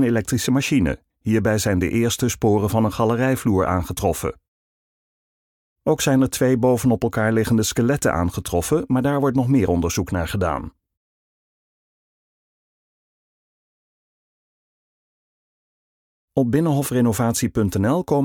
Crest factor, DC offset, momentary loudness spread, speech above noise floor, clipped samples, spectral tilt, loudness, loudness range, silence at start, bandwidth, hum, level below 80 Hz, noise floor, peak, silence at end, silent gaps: 16 dB; under 0.1%; 5 LU; over 71 dB; under 0.1%; -5.5 dB/octave; -20 LUFS; 8 LU; 0 s; 19 kHz; none; -42 dBFS; under -90 dBFS; -6 dBFS; 0 s; 4.48-5.76 s, 10.97-16.28 s